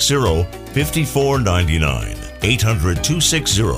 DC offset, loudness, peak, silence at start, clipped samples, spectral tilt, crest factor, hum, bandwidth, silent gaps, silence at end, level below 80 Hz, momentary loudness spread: under 0.1%; -17 LUFS; -2 dBFS; 0 s; under 0.1%; -4 dB/octave; 16 dB; none; 16 kHz; none; 0 s; -28 dBFS; 7 LU